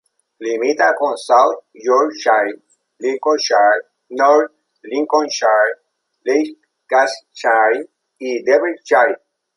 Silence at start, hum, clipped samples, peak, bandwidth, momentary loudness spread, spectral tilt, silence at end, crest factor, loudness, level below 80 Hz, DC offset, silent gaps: 0.4 s; none; under 0.1%; -2 dBFS; 11.5 kHz; 12 LU; -1.5 dB/octave; 0.4 s; 16 dB; -16 LUFS; -74 dBFS; under 0.1%; none